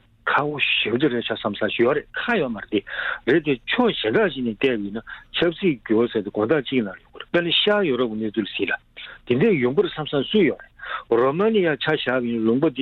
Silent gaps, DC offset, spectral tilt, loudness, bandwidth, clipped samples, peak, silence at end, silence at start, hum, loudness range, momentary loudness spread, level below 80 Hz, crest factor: none; under 0.1%; -8 dB/octave; -22 LUFS; 5.4 kHz; under 0.1%; -6 dBFS; 0 s; 0.25 s; none; 1 LU; 8 LU; -54 dBFS; 16 dB